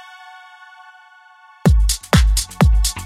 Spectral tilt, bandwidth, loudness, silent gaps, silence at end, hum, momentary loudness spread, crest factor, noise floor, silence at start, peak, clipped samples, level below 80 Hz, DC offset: -4.5 dB/octave; 15 kHz; -16 LUFS; none; 0 s; none; 4 LU; 16 dB; -47 dBFS; 1.65 s; -2 dBFS; under 0.1%; -20 dBFS; under 0.1%